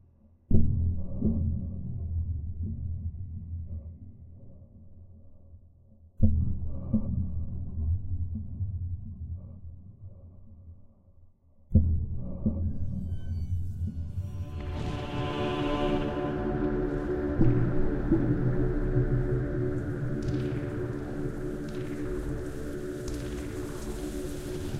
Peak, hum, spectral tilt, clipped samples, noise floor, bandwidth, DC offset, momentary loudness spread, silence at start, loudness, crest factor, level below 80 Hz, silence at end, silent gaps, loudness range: -8 dBFS; none; -8 dB/octave; under 0.1%; -59 dBFS; 11.5 kHz; under 0.1%; 14 LU; 0.5 s; -32 LUFS; 22 dB; -36 dBFS; 0 s; none; 10 LU